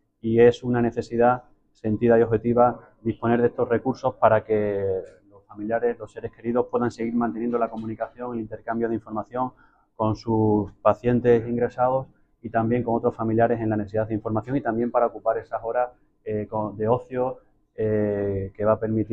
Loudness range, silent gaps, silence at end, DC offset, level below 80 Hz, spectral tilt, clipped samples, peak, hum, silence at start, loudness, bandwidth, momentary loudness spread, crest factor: 5 LU; none; 0 s; under 0.1%; -52 dBFS; -9 dB/octave; under 0.1%; -4 dBFS; none; 0.25 s; -24 LUFS; 7.8 kHz; 12 LU; 20 dB